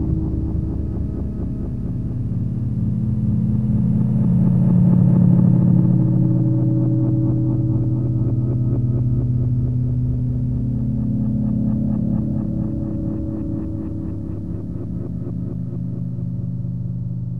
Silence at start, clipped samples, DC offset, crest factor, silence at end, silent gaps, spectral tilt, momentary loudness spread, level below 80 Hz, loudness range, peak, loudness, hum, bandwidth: 0 s; under 0.1%; 2%; 16 dB; 0 s; none; -13 dB/octave; 12 LU; -32 dBFS; 10 LU; -4 dBFS; -20 LUFS; none; 1.9 kHz